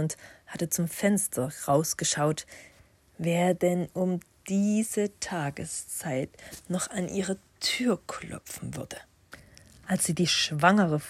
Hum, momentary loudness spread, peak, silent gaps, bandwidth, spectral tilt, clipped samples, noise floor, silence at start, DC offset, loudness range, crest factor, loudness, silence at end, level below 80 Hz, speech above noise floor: none; 14 LU; -6 dBFS; none; 16 kHz; -4 dB/octave; under 0.1%; -59 dBFS; 0 s; under 0.1%; 4 LU; 22 dB; -28 LUFS; 0 s; -62 dBFS; 31 dB